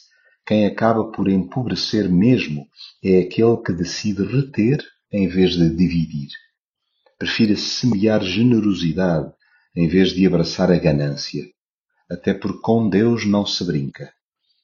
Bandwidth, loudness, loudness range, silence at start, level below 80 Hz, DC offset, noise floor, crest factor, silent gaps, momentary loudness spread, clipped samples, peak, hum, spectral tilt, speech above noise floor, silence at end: 7.2 kHz; -19 LUFS; 2 LU; 0.45 s; -46 dBFS; under 0.1%; -75 dBFS; 16 dB; 6.59-6.74 s, 11.58-11.84 s; 11 LU; under 0.1%; -2 dBFS; none; -6 dB/octave; 57 dB; 0.55 s